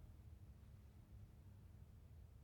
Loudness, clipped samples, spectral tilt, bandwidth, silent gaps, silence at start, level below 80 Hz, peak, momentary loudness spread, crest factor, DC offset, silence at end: -64 LUFS; under 0.1%; -7.5 dB/octave; 19 kHz; none; 0 s; -64 dBFS; -50 dBFS; 1 LU; 12 dB; under 0.1%; 0 s